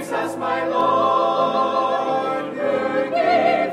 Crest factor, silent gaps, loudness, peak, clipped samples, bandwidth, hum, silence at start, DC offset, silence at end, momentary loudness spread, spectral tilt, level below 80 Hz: 14 dB; none; -20 LUFS; -6 dBFS; under 0.1%; 14 kHz; none; 0 s; under 0.1%; 0 s; 6 LU; -5 dB/octave; -68 dBFS